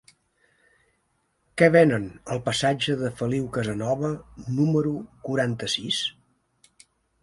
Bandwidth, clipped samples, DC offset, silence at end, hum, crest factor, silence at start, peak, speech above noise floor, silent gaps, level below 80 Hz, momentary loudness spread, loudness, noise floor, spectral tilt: 11.5 kHz; under 0.1%; under 0.1%; 1.1 s; none; 24 dB; 1.55 s; -2 dBFS; 47 dB; none; -56 dBFS; 13 LU; -24 LUFS; -71 dBFS; -5.5 dB/octave